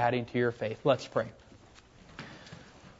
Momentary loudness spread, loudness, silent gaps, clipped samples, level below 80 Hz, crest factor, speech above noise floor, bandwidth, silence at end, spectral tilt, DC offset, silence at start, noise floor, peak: 21 LU; -31 LUFS; none; under 0.1%; -64 dBFS; 20 dB; 26 dB; 8 kHz; 0.1 s; -6.5 dB/octave; under 0.1%; 0 s; -56 dBFS; -12 dBFS